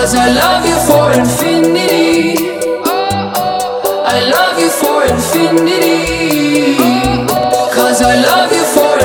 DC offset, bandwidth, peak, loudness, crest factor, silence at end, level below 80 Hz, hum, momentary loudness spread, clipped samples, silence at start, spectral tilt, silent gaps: under 0.1%; over 20 kHz; 0 dBFS; -10 LUFS; 10 dB; 0 s; -34 dBFS; none; 6 LU; 0.3%; 0 s; -4 dB/octave; none